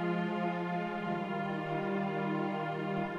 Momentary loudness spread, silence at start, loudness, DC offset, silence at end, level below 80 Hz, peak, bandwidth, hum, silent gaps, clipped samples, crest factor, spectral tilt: 2 LU; 0 s; -35 LUFS; under 0.1%; 0 s; -70 dBFS; -22 dBFS; 7.8 kHz; none; none; under 0.1%; 12 dB; -8 dB/octave